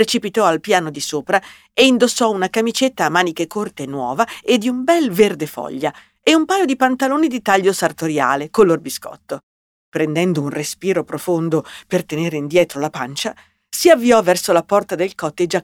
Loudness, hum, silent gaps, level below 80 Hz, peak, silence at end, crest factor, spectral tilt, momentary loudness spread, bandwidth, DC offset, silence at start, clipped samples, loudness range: -17 LUFS; none; 9.43-9.92 s; -58 dBFS; 0 dBFS; 0 s; 16 dB; -4 dB/octave; 11 LU; 18.5 kHz; under 0.1%; 0 s; under 0.1%; 4 LU